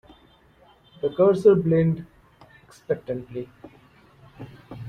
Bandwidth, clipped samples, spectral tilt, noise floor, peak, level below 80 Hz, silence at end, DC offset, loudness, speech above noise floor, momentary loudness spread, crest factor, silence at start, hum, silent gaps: 9.4 kHz; under 0.1%; -9 dB/octave; -56 dBFS; -6 dBFS; -58 dBFS; 0 s; under 0.1%; -22 LUFS; 35 dB; 25 LU; 20 dB; 1.05 s; none; none